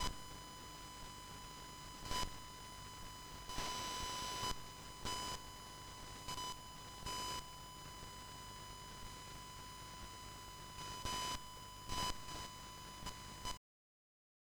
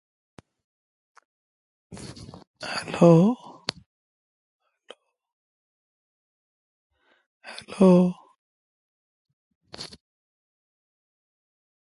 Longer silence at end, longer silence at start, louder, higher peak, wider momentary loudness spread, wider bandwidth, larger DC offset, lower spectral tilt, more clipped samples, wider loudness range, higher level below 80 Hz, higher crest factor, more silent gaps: second, 1 s vs 2 s; second, 0 s vs 1.9 s; second, -47 LUFS vs -21 LUFS; second, -24 dBFS vs -2 dBFS; second, 10 LU vs 25 LU; first, over 20 kHz vs 11.5 kHz; neither; second, -2 dB/octave vs -7.5 dB/octave; neither; second, 4 LU vs 8 LU; first, -56 dBFS vs -66 dBFS; about the same, 24 dB vs 26 dB; second, none vs 2.47-2.54 s, 3.86-4.60 s, 5.33-6.90 s, 7.26-7.41 s, 8.38-9.25 s, 9.33-9.61 s